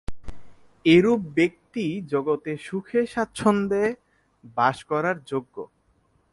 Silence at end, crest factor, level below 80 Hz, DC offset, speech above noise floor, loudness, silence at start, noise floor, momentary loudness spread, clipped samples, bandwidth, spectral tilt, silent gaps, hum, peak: 0.7 s; 18 dB; -50 dBFS; under 0.1%; 42 dB; -24 LUFS; 0.1 s; -65 dBFS; 16 LU; under 0.1%; 11.5 kHz; -6.5 dB/octave; none; none; -6 dBFS